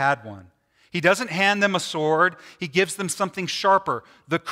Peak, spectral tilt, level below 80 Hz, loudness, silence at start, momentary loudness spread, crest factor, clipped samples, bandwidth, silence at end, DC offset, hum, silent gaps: -4 dBFS; -3.5 dB/octave; -68 dBFS; -22 LUFS; 0 s; 10 LU; 18 dB; under 0.1%; 16 kHz; 0 s; under 0.1%; none; none